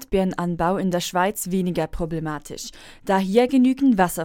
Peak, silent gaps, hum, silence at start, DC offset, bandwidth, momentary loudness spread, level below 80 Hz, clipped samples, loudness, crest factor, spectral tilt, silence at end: -4 dBFS; none; none; 0 s; under 0.1%; 17 kHz; 14 LU; -42 dBFS; under 0.1%; -22 LUFS; 18 dB; -5.5 dB/octave; 0 s